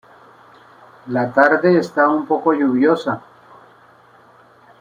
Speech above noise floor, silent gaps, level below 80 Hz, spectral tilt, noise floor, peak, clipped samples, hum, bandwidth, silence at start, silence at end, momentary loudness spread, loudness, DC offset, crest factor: 33 dB; none; -66 dBFS; -7.5 dB/octave; -49 dBFS; -2 dBFS; under 0.1%; none; 10 kHz; 1.05 s; 1.6 s; 10 LU; -16 LUFS; under 0.1%; 18 dB